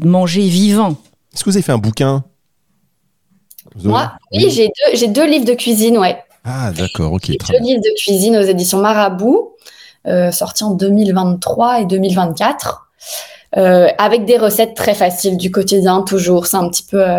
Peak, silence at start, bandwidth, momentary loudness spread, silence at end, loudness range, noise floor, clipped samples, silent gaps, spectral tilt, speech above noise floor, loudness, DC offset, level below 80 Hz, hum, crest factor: 0 dBFS; 0 s; 18 kHz; 10 LU; 0 s; 4 LU; -64 dBFS; under 0.1%; none; -5 dB/octave; 52 dB; -13 LUFS; under 0.1%; -46 dBFS; none; 14 dB